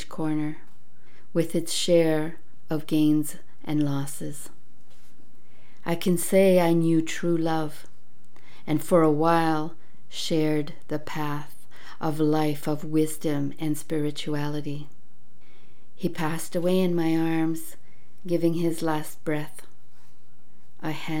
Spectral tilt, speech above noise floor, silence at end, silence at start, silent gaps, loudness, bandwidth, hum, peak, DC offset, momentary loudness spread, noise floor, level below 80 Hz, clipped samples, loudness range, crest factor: -6 dB/octave; 36 dB; 0 s; 0 s; none; -26 LUFS; 17.5 kHz; none; -8 dBFS; 4%; 15 LU; -61 dBFS; -66 dBFS; under 0.1%; 6 LU; 20 dB